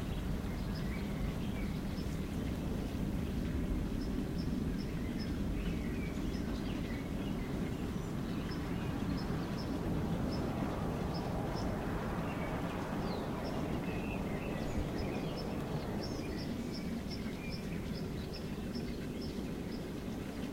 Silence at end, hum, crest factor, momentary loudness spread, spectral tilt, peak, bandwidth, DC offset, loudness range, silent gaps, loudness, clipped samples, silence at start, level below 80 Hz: 0 s; none; 14 dB; 3 LU; -6.5 dB/octave; -24 dBFS; 16 kHz; under 0.1%; 3 LU; none; -39 LUFS; under 0.1%; 0 s; -44 dBFS